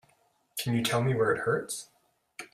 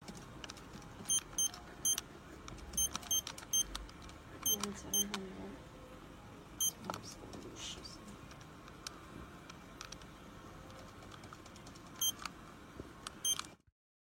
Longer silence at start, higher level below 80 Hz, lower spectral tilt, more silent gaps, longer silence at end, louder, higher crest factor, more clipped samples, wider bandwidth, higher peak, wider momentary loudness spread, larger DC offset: first, 0.55 s vs 0 s; about the same, -64 dBFS vs -60 dBFS; first, -5 dB/octave vs -1 dB/octave; neither; second, 0.1 s vs 0.5 s; first, -29 LUFS vs -37 LUFS; second, 18 dB vs 24 dB; neither; about the same, 16 kHz vs 16.5 kHz; first, -14 dBFS vs -20 dBFS; second, 15 LU vs 19 LU; neither